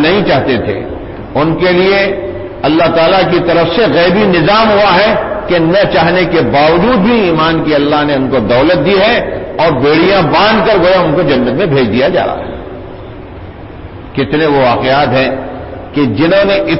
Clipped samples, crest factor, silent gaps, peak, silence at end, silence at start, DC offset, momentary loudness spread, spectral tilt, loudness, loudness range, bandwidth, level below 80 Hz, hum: under 0.1%; 10 dB; none; 0 dBFS; 0 s; 0 s; under 0.1%; 15 LU; -10 dB/octave; -9 LUFS; 5 LU; 5.8 kHz; -32 dBFS; none